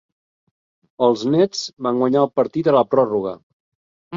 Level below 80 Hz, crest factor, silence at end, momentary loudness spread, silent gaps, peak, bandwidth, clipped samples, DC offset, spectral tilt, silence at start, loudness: -64 dBFS; 18 dB; 0 s; 8 LU; 3.43-4.11 s; -2 dBFS; 7.6 kHz; under 0.1%; under 0.1%; -6 dB/octave; 1 s; -18 LUFS